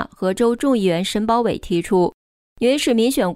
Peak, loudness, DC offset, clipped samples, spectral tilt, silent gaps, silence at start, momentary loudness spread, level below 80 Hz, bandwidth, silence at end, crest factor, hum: -6 dBFS; -19 LUFS; under 0.1%; under 0.1%; -5 dB/octave; 2.14-2.56 s; 0 s; 5 LU; -46 dBFS; 16 kHz; 0 s; 12 dB; none